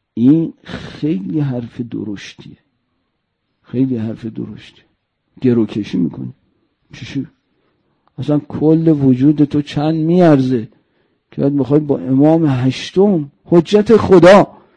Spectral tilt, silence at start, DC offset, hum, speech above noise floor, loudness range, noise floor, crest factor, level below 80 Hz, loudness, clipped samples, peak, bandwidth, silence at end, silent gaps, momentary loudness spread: -8 dB/octave; 0.15 s; under 0.1%; none; 56 dB; 11 LU; -69 dBFS; 14 dB; -50 dBFS; -14 LUFS; under 0.1%; 0 dBFS; 9.8 kHz; 0.3 s; none; 18 LU